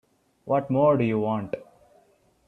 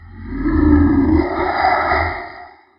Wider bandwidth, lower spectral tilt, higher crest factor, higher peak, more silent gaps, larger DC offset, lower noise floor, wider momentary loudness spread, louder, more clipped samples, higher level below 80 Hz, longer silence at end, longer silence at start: second, 4.3 kHz vs 5.6 kHz; about the same, -10 dB/octave vs -10.5 dB/octave; about the same, 18 dB vs 14 dB; second, -8 dBFS vs -2 dBFS; neither; neither; first, -62 dBFS vs -38 dBFS; about the same, 16 LU vs 14 LU; second, -24 LUFS vs -16 LUFS; neither; second, -64 dBFS vs -26 dBFS; first, 0.85 s vs 0.3 s; first, 0.45 s vs 0 s